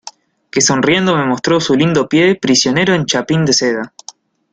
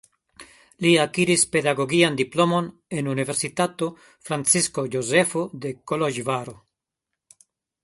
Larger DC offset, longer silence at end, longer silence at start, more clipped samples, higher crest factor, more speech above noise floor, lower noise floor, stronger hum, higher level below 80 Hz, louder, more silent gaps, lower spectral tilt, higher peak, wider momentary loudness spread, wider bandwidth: neither; second, 0.65 s vs 1.3 s; second, 0.05 s vs 0.4 s; neither; second, 14 dB vs 20 dB; second, 25 dB vs 61 dB; second, -38 dBFS vs -84 dBFS; neither; first, -50 dBFS vs -64 dBFS; first, -13 LUFS vs -22 LUFS; neither; about the same, -4 dB/octave vs -3.5 dB/octave; first, 0 dBFS vs -4 dBFS; second, 5 LU vs 11 LU; second, 9.6 kHz vs 12 kHz